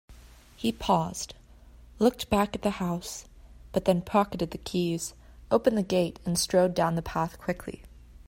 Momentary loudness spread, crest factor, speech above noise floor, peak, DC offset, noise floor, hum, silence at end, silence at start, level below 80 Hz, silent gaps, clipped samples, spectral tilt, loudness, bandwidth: 12 LU; 20 dB; 25 dB; -10 dBFS; under 0.1%; -52 dBFS; none; 0.15 s; 0.1 s; -50 dBFS; none; under 0.1%; -5 dB/octave; -28 LUFS; 16.5 kHz